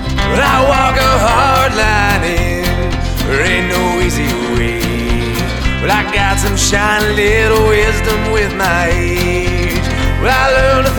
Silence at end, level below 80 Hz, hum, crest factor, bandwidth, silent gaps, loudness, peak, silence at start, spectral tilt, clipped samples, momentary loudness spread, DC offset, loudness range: 0 s; -20 dBFS; none; 12 dB; over 20 kHz; none; -12 LUFS; 0 dBFS; 0 s; -4.5 dB/octave; under 0.1%; 6 LU; under 0.1%; 3 LU